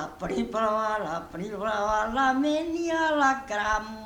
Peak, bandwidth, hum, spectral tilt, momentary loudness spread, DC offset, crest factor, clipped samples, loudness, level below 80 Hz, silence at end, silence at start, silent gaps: -10 dBFS; 18.5 kHz; none; -4.5 dB/octave; 8 LU; under 0.1%; 16 dB; under 0.1%; -27 LUFS; -50 dBFS; 0 s; 0 s; none